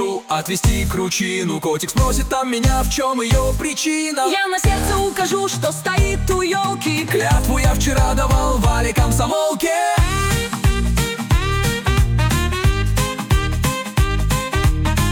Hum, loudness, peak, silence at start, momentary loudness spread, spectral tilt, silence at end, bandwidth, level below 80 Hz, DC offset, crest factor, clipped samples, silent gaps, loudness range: none; -18 LUFS; -6 dBFS; 0 s; 3 LU; -4.5 dB/octave; 0 s; 19 kHz; -22 dBFS; under 0.1%; 12 dB; under 0.1%; none; 1 LU